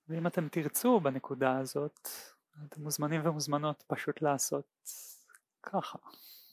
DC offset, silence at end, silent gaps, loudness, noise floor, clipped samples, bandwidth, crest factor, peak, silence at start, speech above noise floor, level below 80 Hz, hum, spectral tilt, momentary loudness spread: under 0.1%; 0.1 s; none; -33 LUFS; -64 dBFS; under 0.1%; 16 kHz; 22 dB; -14 dBFS; 0.1 s; 30 dB; -86 dBFS; none; -5 dB/octave; 21 LU